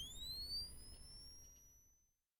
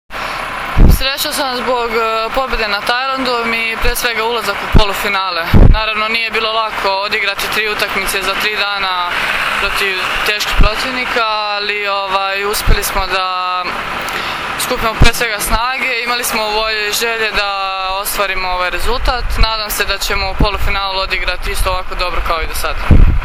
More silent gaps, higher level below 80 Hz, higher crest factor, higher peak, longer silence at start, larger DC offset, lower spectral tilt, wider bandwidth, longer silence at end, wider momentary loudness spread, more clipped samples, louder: neither; second, -62 dBFS vs -18 dBFS; about the same, 16 dB vs 14 dB; second, -38 dBFS vs 0 dBFS; about the same, 0 s vs 0.1 s; neither; second, -1.5 dB/octave vs -3.5 dB/octave; first, 19.5 kHz vs 17 kHz; first, 0.4 s vs 0 s; first, 21 LU vs 5 LU; second, under 0.1% vs 0.4%; second, -49 LUFS vs -15 LUFS